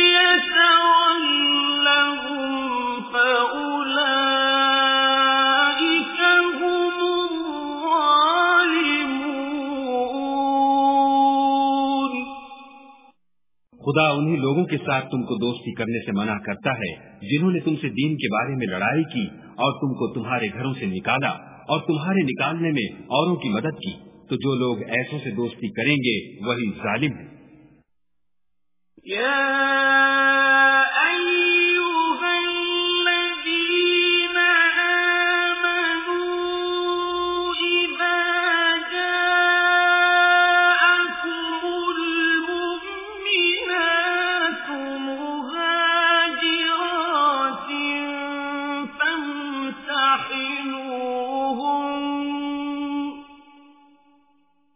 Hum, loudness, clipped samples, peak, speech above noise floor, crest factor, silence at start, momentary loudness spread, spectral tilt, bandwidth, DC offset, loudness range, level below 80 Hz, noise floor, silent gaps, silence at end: none; -20 LUFS; under 0.1%; -4 dBFS; 60 dB; 18 dB; 0 s; 11 LU; -8 dB/octave; 3.9 kHz; under 0.1%; 7 LU; -62 dBFS; -83 dBFS; none; 1.4 s